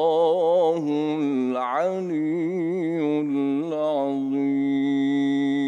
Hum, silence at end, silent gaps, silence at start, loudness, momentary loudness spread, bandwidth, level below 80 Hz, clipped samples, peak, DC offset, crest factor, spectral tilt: none; 0 s; none; 0 s; -23 LUFS; 5 LU; 7.8 kHz; -74 dBFS; under 0.1%; -10 dBFS; under 0.1%; 12 dB; -7.5 dB/octave